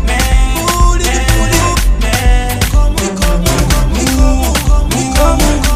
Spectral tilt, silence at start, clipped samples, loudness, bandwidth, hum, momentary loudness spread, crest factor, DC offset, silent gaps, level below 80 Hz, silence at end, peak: -4 dB/octave; 0 s; under 0.1%; -12 LUFS; 15.5 kHz; none; 2 LU; 10 dB; under 0.1%; none; -12 dBFS; 0 s; 0 dBFS